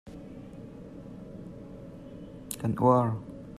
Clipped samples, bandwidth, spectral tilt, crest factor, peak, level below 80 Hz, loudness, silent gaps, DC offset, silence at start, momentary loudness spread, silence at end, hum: under 0.1%; 14 kHz; -7.5 dB/octave; 22 dB; -10 dBFS; -56 dBFS; -27 LUFS; none; under 0.1%; 0.05 s; 22 LU; 0 s; none